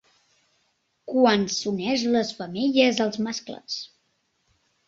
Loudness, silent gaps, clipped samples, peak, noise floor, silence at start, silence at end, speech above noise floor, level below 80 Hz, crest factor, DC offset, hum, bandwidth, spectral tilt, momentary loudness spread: -24 LUFS; none; under 0.1%; -6 dBFS; -71 dBFS; 1.05 s; 1 s; 48 dB; -66 dBFS; 20 dB; under 0.1%; none; 7.8 kHz; -4 dB/octave; 13 LU